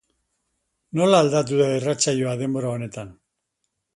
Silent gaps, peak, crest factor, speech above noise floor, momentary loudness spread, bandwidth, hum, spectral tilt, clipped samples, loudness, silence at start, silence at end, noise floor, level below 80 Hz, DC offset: none; -4 dBFS; 20 dB; 56 dB; 15 LU; 11.5 kHz; none; -5 dB/octave; under 0.1%; -21 LUFS; 0.95 s; 0.85 s; -77 dBFS; -62 dBFS; under 0.1%